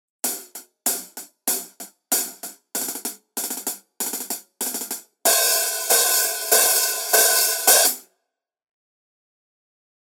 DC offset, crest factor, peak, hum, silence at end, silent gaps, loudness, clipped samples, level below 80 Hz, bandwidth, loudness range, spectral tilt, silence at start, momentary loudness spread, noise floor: under 0.1%; 22 dB; -2 dBFS; none; 2 s; none; -19 LUFS; under 0.1%; under -90 dBFS; over 20 kHz; 10 LU; 2 dB/octave; 0.25 s; 15 LU; -78 dBFS